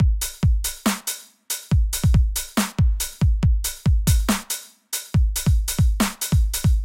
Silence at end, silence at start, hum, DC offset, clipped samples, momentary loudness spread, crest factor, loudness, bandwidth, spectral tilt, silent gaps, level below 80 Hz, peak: 0 s; 0 s; none; under 0.1%; under 0.1%; 9 LU; 14 dB; -22 LUFS; 17 kHz; -4.5 dB/octave; none; -22 dBFS; -6 dBFS